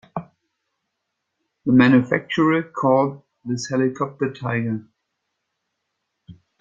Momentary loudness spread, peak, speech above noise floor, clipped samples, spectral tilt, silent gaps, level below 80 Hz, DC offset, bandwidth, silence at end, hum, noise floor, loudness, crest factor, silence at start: 15 LU; -2 dBFS; 59 dB; under 0.1%; -6.5 dB/octave; none; -62 dBFS; under 0.1%; 7.6 kHz; 0.3 s; none; -78 dBFS; -20 LUFS; 20 dB; 0.15 s